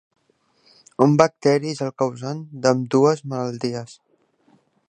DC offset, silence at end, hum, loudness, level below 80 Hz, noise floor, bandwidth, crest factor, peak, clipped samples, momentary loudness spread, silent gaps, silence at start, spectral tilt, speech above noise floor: under 0.1%; 0.95 s; none; -21 LUFS; -66 dBFS; -64 dBFS; 9.6 kHz; 22 dB; 0 dBFS; under 0.1%; 14 LU; none; 1 s; -6.5 dB/octave; 44 dB